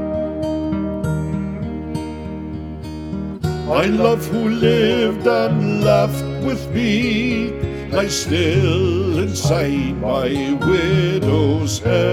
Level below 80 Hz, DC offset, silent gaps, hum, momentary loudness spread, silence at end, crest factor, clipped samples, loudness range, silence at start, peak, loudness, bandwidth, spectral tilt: -36 dBFS; under 0.1%; none; none; 11 LU; 0 s; 16 dB; under 0.1%; 6 LU; 0 s; -2 dBFS; -18 LUFS; 16.5 kHz; -6 dB/octave